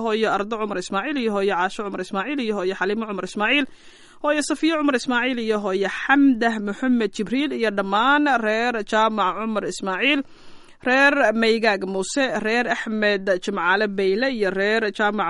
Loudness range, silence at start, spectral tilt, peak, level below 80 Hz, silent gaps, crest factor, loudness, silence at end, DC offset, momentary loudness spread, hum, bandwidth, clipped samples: 4 LU; 0 s; -4 dB/octave; -4 dBFS; -56 dBFS; none; 18 dB; -21 LUFS; 0 s; under 0.1%; 8 LU; none; 11.5 kHz; under 0.1%